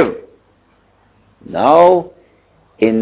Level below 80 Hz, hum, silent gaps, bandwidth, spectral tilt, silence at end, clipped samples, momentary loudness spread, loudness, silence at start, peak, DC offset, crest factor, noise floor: -52 dBFS; 50 Hz at -50 dBFS; none; 4 kHz; -10.5 dB/octave; 0 s; under 0.1%; 22 LU; -12 LUFS; 0 s; 0 dBFS; under 0.1%; 16 dB; -54 dBFS